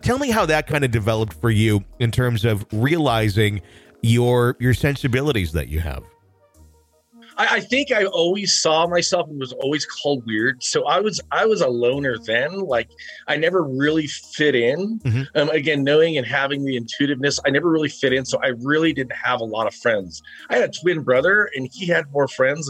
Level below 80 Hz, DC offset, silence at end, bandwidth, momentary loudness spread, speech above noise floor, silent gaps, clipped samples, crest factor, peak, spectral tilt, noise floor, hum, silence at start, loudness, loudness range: -42 dBFS; under 0.1%; 0 s; 15.5 kHz; 7 LU; 35 dB; none; under 0.1%; 14 dB; -6 dBFS; -5 dB/octave; -55 dBFS; none; 0 s; -20 LUFS; 2 LU